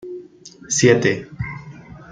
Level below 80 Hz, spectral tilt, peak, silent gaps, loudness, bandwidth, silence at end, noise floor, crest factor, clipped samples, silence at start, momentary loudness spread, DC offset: -50 dBFS; -4.5 dB/octave; -2 dBFS; none; -18 LUFS; 9.6 kHz; 0 s; -39 dBFS; 20 dB; under 0.1%; 0.05 s; 23 LU; under 0.1%